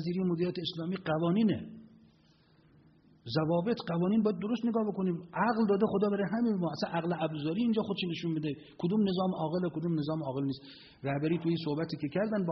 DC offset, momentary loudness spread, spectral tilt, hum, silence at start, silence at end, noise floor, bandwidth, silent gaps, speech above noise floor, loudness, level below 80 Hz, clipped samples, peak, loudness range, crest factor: under 0.1%; 8 LU; -6 dB/octave; none; 0 s; 0 s; -64 dBFS; 6 kHz; none; 33 dB; -32 LUFS; -68 dBFS; under 0.1%; -16 dBFS; 4 LU; 16 dB